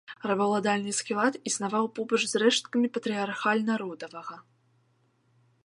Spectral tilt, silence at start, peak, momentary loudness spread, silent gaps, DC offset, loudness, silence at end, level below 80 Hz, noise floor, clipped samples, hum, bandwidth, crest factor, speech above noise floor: -3.5 dB/octave; 0.1 s; -10 dBFS; 12 LU; none; under 0.1%; -27 LUFS; 1.25 s; -80 dBFS; -69 dBFS; under 0.1%; none; 11.5 kHz; 20 dB; 41 dB